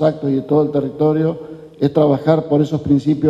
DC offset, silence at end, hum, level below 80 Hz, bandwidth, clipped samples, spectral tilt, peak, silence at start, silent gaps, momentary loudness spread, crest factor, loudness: under 0.1%; 0 s; none; -48 dBFS; 7.6 kHz; under 0.1%; -9.5 dB/octave; 0 dBFS; 0 s; none; 6 LU; 16 dB; -16 LUFS